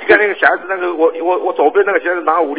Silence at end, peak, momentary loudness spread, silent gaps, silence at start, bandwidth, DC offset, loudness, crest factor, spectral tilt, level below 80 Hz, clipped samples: 0 s; 0 dBFS; 5 LU; none; 0 s; 4 kHz; 0.4%; -14 LUFS; 14 dB; -7 dB/octave; -58 dBFS; 0.3%